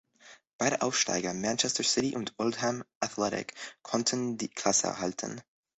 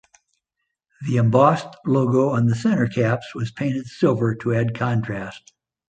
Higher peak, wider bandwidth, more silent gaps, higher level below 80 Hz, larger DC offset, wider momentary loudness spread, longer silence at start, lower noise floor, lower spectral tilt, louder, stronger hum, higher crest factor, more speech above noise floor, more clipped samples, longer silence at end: second, -10 dBFS vs -2 dBFS; about the same, 8.4 kHz vs 9 kHz; first, 0.53-0.59 s, 2.95-3.01 s vs none; second, -68 dBFS vs -56 dBFS; neither; about the same, 10 LU vs 11 LU; second, 0.25 s vs 1 s; second, -57 dBFS vs -79 dBFS; second, -2.5 dB/octave vs -8 dB/octave; second, -30 LUFS vs -21 LUFS; neither; about the same, 22 dB vs 20 dB; second, 26 dB vs 59 dB; neither; second, 0.35 s vs 0.5 s